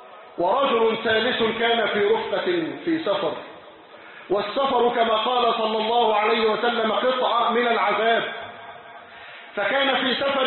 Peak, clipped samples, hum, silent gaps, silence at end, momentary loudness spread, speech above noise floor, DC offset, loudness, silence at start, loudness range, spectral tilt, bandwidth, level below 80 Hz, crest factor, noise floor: -8 dBFS; under 0.1%; none; none; 0 s; 18 LU; 23 dB; under 0.1%; -21 LUFS; 0 s; 4 LU; -8.5 dB/octave; 4.3 kHz; -64 dBFS; 14 dB; -45 dBFS